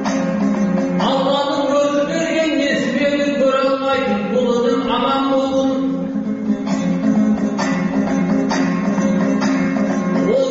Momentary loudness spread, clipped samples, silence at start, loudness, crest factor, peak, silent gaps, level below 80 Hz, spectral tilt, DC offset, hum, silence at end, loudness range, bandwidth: 3 LU; under 0.1%; 0 s; -17 LUFS; 12 dB; -6 dBFS; none; -50 dBFS; -5 dB/octave; under 0.1%; none; 0 s; 1 LU; 8 kHz